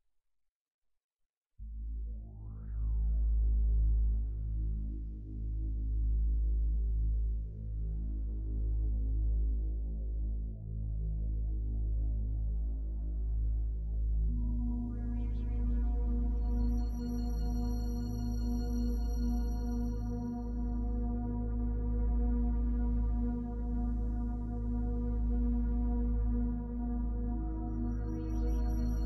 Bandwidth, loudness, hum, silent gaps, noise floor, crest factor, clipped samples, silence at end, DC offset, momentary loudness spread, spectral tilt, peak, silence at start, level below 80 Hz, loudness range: 6 kHz; -36 LUFS; none; none; -81 dBFS; 10 dB; under 0.1%; 0 s; under 0.1%; 6 LU; -9.5 dB/octave; -24 dBFS; 1.6 s; -34 dBFS; 2 LU